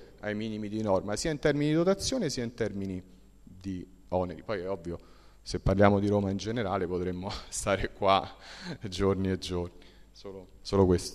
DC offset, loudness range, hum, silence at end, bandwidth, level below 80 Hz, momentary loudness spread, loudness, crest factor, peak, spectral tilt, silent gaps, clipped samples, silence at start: under 0.1%; 6 LU; none; 0 s; 13.5 kHz; -48 dBFS; 17 LU; -30 LUFS; 22 dB; -8 dBFS; -5.5 dB/octave; none; under 0.1%; 0 s